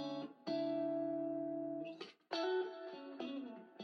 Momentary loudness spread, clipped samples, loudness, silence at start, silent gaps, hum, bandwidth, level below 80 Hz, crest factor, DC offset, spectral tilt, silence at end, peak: 11 LU; under 0.1%; -42 LUFS; 0 s; none; none; 6.8 kHz; under -90 dBFS; 14 dB; under 0.1%; -6 dB/octave; 0 s; -28 dBFS